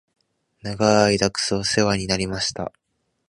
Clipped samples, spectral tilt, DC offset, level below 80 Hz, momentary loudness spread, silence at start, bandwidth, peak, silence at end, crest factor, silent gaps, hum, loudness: under 0.1%; -4 dB/octave; under 0.1%; -48 dBFS; 16 LU; 0.65 s; 11.5 kHz; -2 dBFS; 0.6 s; 22 dB; none; none; -20 LUFS